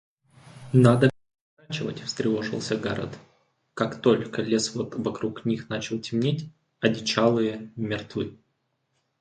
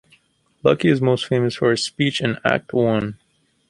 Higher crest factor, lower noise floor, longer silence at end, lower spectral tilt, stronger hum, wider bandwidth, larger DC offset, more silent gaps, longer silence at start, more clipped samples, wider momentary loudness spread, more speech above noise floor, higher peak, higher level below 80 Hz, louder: about the same, 24 dB vs 20 dB; first, -74 dBFS vs -59 dBFS; first, 0.85 s vs 0.55 s; about the same, -6 dB/octave vs -5.5 dB/octave; neither; about the same, 11.5 kHz vs 11.5 kHz; neither; first, 1.41-1.57 s vs none; about the same, 0.55 s vs 0.65 s; neither; first, 12 LU vs 4 LU; first, 50 dB vs 41 dB; second, -4 dBFS vs 0 dBFS; second, -60 dBFS vs -54 dBFS; second, -26 LUFS vs -19 LUFS